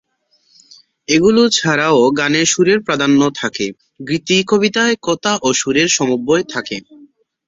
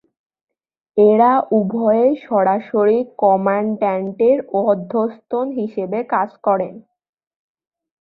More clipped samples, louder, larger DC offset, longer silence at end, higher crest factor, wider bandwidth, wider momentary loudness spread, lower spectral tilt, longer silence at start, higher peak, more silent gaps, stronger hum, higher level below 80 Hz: neither; first, -14 LUFS vs -17 LUFS; neither; second, 0.4 s vs 1.2 s; about the same, 14 dB vs 16 dB; first, 8 kHz vs 4.6 kHz; about the same, 11 LU vs 9 LU; second, -3.5 dB/octave vs -11 dB/octave; first, 1.1 s vs 0.95 s; about the same, 0 dBFS vs -2 dBFS; neither; neither; first, -54 dBFS vs -64 dBFS